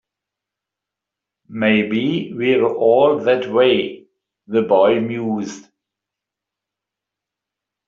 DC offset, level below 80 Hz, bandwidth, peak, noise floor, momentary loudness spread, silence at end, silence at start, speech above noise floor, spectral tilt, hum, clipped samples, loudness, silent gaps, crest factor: under 0.1%; -64 dBFS; 7.6 kHz; -2 dBFS; -85 dBFS; 9 LU; 2.25 s; 1.5 s; 69 dB; -4 dB/octave; 50 Hz at -55 dBFS; under 0.1%; -17 LUFS; none; 16 dB